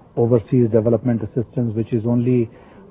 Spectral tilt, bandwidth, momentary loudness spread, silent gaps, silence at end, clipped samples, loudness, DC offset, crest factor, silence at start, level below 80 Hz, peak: -14 dB/octave; 3.9 kHz; 6 LU; none; 0.45 s; under 0.1%; -19 LUFS; under 0.1%; 16 dB; 0.15 s; -48 dBFS; -2 dBFS